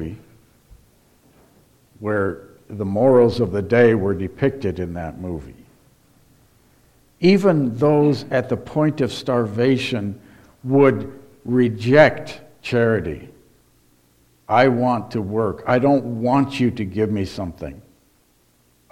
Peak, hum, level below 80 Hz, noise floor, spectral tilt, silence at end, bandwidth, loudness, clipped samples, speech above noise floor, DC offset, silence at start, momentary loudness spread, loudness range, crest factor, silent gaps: 0 dBFS; none; -50 dBFS; -59 dBFS; -7.5 dB/octave; 1.1 s; 14.5 kHz; -19 LUFS; under 0.1%; 41 dB; under 0.1%; 0 s; 17 LU; 4 LU; 20 dB; none